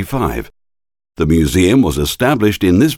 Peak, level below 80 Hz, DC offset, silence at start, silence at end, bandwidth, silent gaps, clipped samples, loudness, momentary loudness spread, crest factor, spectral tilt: -2 dBFS; -30 dBFS; under 0.1%; 0 s; 0 s; 17.5 kHz; none; under 0.1%; -14 LUFS; 9 LU; 14 dB; -6 dB/octave